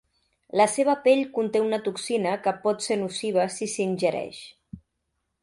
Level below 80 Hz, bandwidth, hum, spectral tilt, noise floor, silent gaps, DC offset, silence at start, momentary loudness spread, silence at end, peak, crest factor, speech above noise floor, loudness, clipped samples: -66 dBFS; 11.5 kHz; none; -4 dB/octave; -78 dBFS; none; under 0.1%; 0.55 s; 8 LU; 0.65 s; -6 dBFS; 18 dB; 54 dB; -25 LUFS; under 0.1%